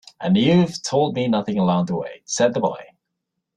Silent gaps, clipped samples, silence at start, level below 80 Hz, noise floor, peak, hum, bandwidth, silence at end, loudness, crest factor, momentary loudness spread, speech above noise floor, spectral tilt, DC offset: none; under 0.1%; 0.2 s; -58 dBFS; -79 dBFS; -4 dBFS; none; 9.8 kHz; 0.75 s; -20 LUFS; 16 dB; 10 LU; 59 dB; -5.5 dB/octave; under 0.1%